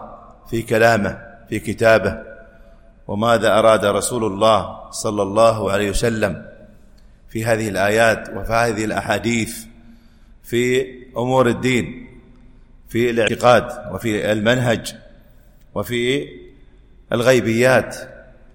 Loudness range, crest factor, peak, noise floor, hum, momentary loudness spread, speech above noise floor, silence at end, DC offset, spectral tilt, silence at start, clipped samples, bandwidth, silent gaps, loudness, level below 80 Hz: 4 LU; 18 dB; -2 dBFS; -47 dBFS; none; 14 LU; 29 dB; 0.35 s; under 0.1%; -5 dB/octave; 0 s; under 0.1%; 17 kHz; none; -18 LUFS; -40 dBFS